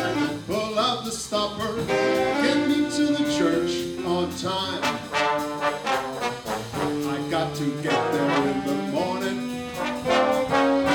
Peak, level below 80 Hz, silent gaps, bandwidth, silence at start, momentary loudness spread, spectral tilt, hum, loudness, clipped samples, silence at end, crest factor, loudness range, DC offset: -8 dBFS; -54 dBFS; none; 19.5 kHz; 0 s; 7 LU; -4.5 dB/octave; none; -24 LUFS; under 0.1%; 0 s; 16 dB; 3 LU; under 0.1%